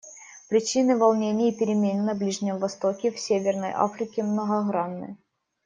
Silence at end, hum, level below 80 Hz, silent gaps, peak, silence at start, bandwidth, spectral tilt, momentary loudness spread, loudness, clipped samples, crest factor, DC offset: 0.5 s; none; -72 dBFS; none; -6 dBFS; 0.05 s; 9.6 kHz; -5.5 dB/octave; 8 LU; -25 LUFS; under 0.1%; 18 dB; under 0.1%